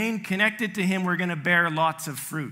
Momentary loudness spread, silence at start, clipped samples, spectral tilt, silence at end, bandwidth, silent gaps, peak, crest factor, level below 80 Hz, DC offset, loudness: 10 LU; 0 s; under 0.1%; -4.5 dB/octave; 0 s; 16 kHz; none; -8 dBFS; 16 dB; -72 dBFS; under 0.1%; -24 LUFS